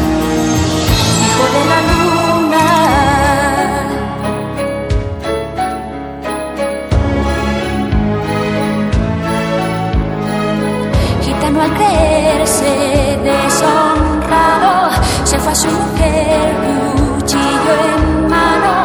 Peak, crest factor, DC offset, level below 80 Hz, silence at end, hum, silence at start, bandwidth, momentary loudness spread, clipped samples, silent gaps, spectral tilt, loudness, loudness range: 0 dBFS; 12 dB; under 0.1%; -24 dBFS; 0 s; none; 0 s; over 20 kHz; 8 LU; under 0.1%; none; -4.5 dB/octave; -13 LUFS; 6 LU